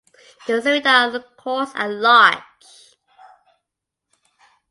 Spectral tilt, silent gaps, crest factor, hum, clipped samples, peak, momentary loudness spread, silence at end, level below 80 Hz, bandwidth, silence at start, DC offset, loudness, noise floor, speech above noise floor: -2.5 dB/octave; none; 20 dB; none; under 0.1%; 0 dBFS; 17 LU; 2.3 s; -74 dBFS; 11.5 kHz; 0.45 s; under 0.1%; -16 LUFS; -82 dBFS; 65 dB